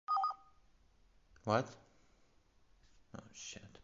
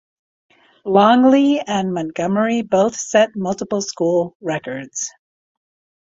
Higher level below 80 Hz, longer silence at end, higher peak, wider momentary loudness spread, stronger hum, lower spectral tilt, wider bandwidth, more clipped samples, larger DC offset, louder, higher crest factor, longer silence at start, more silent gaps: second, -72 dBFS vs -60 dBFS; second, 0.15 s vs 0.95 s; second, -18 dBFS vs -2 dBFS; first, 19 LU vs 13 LU; neither; about the same, -4.5 dB/octave vs -5 dB/octave; about the same, 7.6 kHz vs 7.8 kHz; neither; neither; second, -40 LUFS vs -17 LUFS; first, 24 dB vs 16 dB; second, 0.1 s vs 0.85 s; second, none vs 4.35-4.40 s